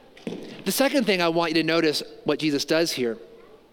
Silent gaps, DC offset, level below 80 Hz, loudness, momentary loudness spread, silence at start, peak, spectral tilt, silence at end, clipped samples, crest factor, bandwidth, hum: none; under 0.1%; -64 dBFS; -23 LUFS; 14 LU; 0.2 s; -6 dBFS; -4 dB/octave; 0.35 s; under 0.1%; 18 dB; 17 kHz; none